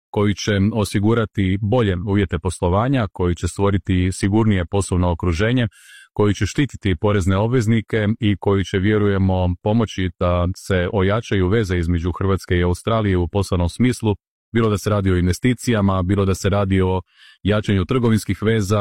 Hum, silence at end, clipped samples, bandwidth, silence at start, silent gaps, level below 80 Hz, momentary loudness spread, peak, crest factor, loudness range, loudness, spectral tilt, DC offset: none; 0 s; under 0.1%; 13 kHz; 0.15 s; 14.28-14.52 s; -40 dBFS; 4 LU; -6 dBFS; 12 dB; 1 LU; -19 LUFS; -6.5 dB/octave; 0.4%